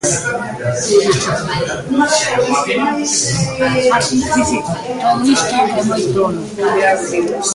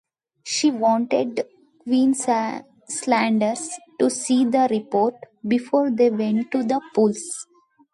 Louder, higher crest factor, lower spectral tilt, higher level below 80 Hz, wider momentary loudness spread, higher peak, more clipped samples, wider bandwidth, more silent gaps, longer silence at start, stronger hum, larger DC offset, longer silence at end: first, -15 LUFS vs -21 LUFS; about the same, 14 dB vs 16 dB; about the same, -3.5 dB/octave vs -4 dB/octave; first, -42 dBFS vs -72 dBFS; second, 6 LU vs 13 LU; first, 0 dBFS vs -6 dBFS; neither; about the same, 11.5 kHz vs 11.5 kHz; neither; second, 0.05 s vs 0.45 s; neither; neither; second, 0 s vs 0.5 s